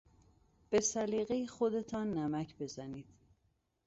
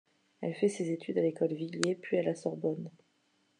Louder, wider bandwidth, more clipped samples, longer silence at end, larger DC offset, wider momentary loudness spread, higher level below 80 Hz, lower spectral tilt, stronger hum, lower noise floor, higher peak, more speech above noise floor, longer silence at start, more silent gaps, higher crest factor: second, -36 LUFS vs -33 LUFS; second, 8 kHz vs 10.5 kHz; neither; first, 0.85 s vs 0.7 s; neither; first, 13 LU vs 9 LU; first, -68 dBFS vs -86 dBFS; about the same, -6 dB/octave vs -5.5 dB/octave; neither; first, -78 dBFS vs -73 dBFS; second, -18 dBFS vs -10 dBFS; about the same, 42 dB vs 41 dB; first, 0.7 s vs 0.4 s; neither; about the same, 20 dB vs 24 dB